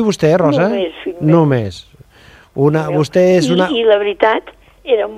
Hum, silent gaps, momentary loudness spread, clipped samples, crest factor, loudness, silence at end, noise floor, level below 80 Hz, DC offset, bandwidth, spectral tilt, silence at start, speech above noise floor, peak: none; none; 10 LU; under 0.1%; 14 dB; -14 LUFS; 0 s; -44 dBFS; -48 dBFS; under 0.1%; 13 kHz; -6.5 dB/octave; 0 s; 31 dB; 0 dBFS